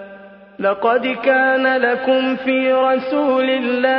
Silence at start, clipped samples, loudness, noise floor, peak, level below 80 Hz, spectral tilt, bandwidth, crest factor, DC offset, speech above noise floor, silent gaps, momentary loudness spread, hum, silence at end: 0 s; under 0.1%; -16 LUFS; -40 dBFS; -2 dBFS; -62 dBFS; -7 dB/octave; 5.4 kHz; 16 dB; under 0.1%; 24 dB; none; 3 LU; none; 0 s